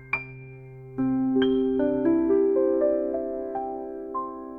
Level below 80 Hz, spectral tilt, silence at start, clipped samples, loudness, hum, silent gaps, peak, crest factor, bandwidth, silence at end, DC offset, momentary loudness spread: -56 dBFS; -9.5 dB/octave; 0 s; under 0.1%; -25 LUFS; none; none; -12 dBFS; 14 dB; 5 kHz; 0 s; under 0.1%; 16 LU